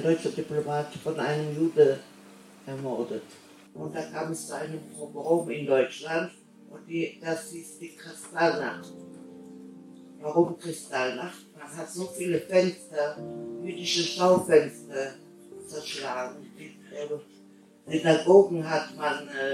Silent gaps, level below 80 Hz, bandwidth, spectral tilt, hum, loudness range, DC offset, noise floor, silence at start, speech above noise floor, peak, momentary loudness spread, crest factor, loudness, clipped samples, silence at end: none; -76 dBFS; 15 kHz; -5 dB/octave; none; 7 LU; under 0.1%; -54 dBFS; 0 s; 27 dB; -4 dBFS; 21 LU; 24 dB; -28 LUFS; under 0.1%; 0 s